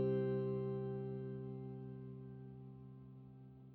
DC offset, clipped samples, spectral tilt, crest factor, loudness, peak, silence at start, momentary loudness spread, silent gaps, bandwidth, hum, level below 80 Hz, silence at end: under 0.1%; under 0.1%; -10 dB/octave; 14 dB; -44 LUFS; -28 dBFS; 0 s; 18 LU; none; 4.4 kHz; none; -72 dBFS; 0 s